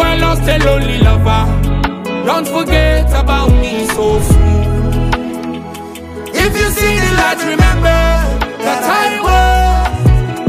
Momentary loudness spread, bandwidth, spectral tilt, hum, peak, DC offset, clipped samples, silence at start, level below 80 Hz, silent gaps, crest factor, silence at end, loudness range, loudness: 7 LU; 15.5 kHz; -5.5 dB/octave; none; 0 dBFS; under 0.1%; under 0.1%; 0 s; -16 dBFS; none; 12 dB; 0 s; 2 LU; -12 LUFS